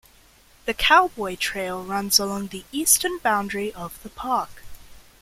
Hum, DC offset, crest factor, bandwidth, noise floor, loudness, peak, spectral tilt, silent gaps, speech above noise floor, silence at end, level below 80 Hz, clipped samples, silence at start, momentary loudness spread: none; under 0.1%; 22 dB; 16.5 kHz; -54 dBFS; -22 LUFS; -2 dBFS; -1.5 dB/octave; none; 31 dB; 0.2 s; -48 dBFS; under 0.1%; 0.65 s; 16 LU